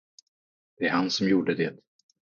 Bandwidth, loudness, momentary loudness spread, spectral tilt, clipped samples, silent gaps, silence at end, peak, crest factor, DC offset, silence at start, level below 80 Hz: 7.4 kHz; -26 LUFS; 6 LU; -5 dB/octave; under 0.1%; none; 0.6 s; -12 dBFS; 18 dB; under 0.1%; 0.8 s; -68 dBFS